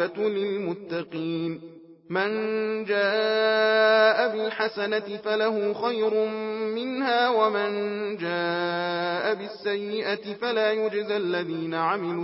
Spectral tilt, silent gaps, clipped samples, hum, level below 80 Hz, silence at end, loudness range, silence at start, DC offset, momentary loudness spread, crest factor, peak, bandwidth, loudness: -9 dB/octave; none; under 0.1%; none; -76 dBFS; 0 s; 4 LU; 0 s; under 0.1%; 9 LU; 18 dB; -8 dBFS; 5.8 kHz; -25 LUFS